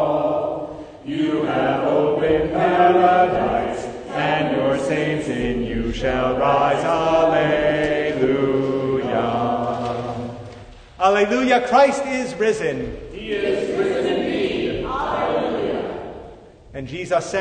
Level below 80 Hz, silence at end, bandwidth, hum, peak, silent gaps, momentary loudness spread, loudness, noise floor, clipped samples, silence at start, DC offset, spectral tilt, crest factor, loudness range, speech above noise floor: -42 dBFS; 0 s; 9.6 kHz; none; -2 dBFS; none; 13 LU; -20 LUFS; -42 dBFS; under 0.1%; 0 s; under 0.1%; -6 dB/octave; 18 dB; 4 LU; 23 dB